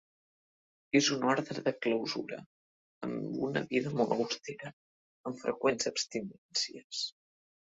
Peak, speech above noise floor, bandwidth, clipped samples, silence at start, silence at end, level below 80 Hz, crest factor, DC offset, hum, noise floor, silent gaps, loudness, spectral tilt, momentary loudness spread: -14 dBFS; over 57 dB; 8 kHz; under 0.1%; 0.95 s; 0.65 s; -74 dBFS; 22 dB; under 0.1%; none; under -90 dBFS; 2.46-3.01 s, 4.73-5.24 s, 6.38-6.49 s, 6.84-6.90 s; -33 LUFS; -3.5 dB/octave; 15 LU